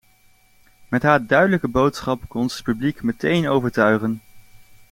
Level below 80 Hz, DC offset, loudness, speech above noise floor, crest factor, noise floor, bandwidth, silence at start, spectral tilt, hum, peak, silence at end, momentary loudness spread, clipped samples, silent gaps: -48 dBFS; under 0.1%; -20 LUFS; 36 dB; 18 dB; -55 dBFS; 16.5 kHz; 0.9 s; -6.5 dB/octave; none; -2 dBFS; 0.35 s; 9 LU; under 0.1%; none